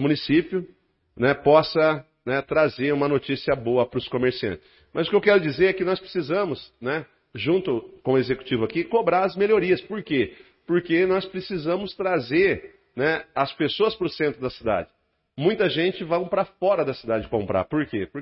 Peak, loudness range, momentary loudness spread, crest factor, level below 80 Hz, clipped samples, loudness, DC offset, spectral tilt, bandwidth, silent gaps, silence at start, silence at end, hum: -2 dBFS; 3 LU; 9 LU; 20 dB; -54 dBFS; under 0.1%; -23 LUFS; under 0.1%; -10.5 dB/octave; 5.8 kHz; none; 0 s; 0 s; none